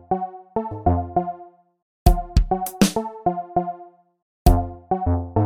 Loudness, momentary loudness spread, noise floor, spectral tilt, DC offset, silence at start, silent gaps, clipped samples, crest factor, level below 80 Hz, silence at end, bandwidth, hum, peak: -23 LUFS; 9 LU; -45 dBFS; -6.5 dB/octave; under 0.1%; 0.1 s; 1.82-2.06 s, 4.22-4.45 s; under 0.1%; 22 dB; -26 dBFS; 0 s; 17.5 kHz; none; 0 dBFS